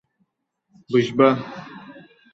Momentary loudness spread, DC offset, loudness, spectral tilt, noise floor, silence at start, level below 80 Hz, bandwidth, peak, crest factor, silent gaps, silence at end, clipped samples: 23 LU; under 0.1%; -19 LUFS; -7 dB/octave; -72 dBFS; 0.9 s; -66 dBFS; 7.8 kHz; -2 dBFS; 22 dB; none; 0.35 s; under 0.1%